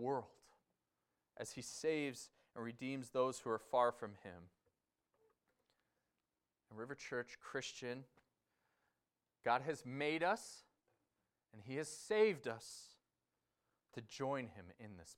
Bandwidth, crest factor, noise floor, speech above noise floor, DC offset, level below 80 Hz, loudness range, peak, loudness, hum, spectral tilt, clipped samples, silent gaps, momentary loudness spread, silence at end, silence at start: 16 kHz; 22 dB; under -90 dBFS; over 48 dB; under 0.1%; -84 dBFS; 9 LU; -22 dBFS; -42 LUFS; none; -4.5 dB/octave; under 0.1%; none; 20 LU; 0.05 s; 0 s